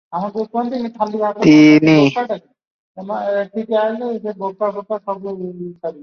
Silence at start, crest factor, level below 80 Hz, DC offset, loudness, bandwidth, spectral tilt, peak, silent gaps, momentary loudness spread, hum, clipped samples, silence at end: 0.1 s; 16 dB; -58 dBFS; under 0.1%; -16 LUFS; 6.8 kHz; -7 dB/octave; 0 dBFS; 2.67-2.95 s; 18 LU; none; under 0.1%; 0 s